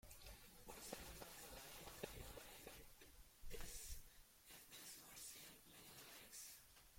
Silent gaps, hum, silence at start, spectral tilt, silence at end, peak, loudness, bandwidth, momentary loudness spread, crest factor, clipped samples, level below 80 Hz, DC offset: none; none; 0.05 s; -2 dB/octave; 0 s; -36 dBFS; -58 LUFS; 16.5 kHz; 8 LU; 22 dB; under 0.1%; -64 dBFS; under 0.1%